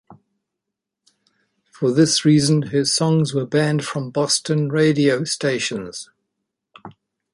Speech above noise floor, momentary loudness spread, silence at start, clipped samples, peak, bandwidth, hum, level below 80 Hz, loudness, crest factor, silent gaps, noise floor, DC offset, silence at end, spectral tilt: 64 dB; 9 LU; 0.1 s; under 0.1%; -2 dBFS; 11.5 kHz; none; -60 dBFS; -18 LUFS; 18 dB; none; -82 dBFS; under 0.1%; 0.45 s; -5 dB/octave